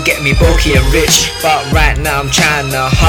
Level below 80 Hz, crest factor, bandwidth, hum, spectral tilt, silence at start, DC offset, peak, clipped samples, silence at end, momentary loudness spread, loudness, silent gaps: -16 dBFS; 10 dB; 18.5 kHz; none; -3.5 dB/octave; 0 s; under 0.1%; 0 dBFS; under 0.1%; 0 s; 4 LU; -10 LUFS; none